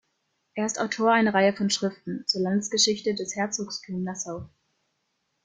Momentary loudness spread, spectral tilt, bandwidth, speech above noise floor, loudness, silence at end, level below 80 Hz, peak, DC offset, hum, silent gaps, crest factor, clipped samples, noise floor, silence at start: 11 LU; -3.5 dB/octave; 9.6 kHz; 50 dB; -25 LUFS; 0.95 s; -66 dBFS; -8 dBFS; under 0.1%; none; none; 20 dB; under 0.1%; -76 dBFS; 0.55 s